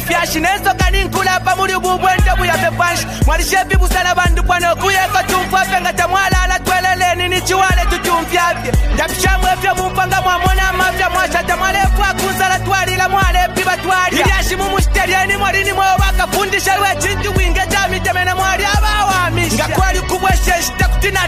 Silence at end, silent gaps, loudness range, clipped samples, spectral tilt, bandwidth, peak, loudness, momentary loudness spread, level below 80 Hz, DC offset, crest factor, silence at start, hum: 0 s; none; 1 LU; under 0.1%; -3.5 dB/octave; 15.5 kHz; -2 dBFS; -14 LUFS; 2 LU; -20 dBFS; under 0.1%; 12 dB; 0 s; none